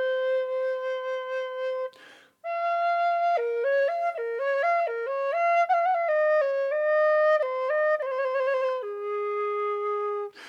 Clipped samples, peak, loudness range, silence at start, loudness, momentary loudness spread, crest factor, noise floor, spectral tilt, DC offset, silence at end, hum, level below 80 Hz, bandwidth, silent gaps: under 0.1%; -14 dBFS; 4 LU; 0 s; -26 LUFS; 8 LU; 12 dB; -53 dBFS; -2 dB/octave; under 0.1%; 0 s; none; under -90 dBFS; 7.2 kHz; none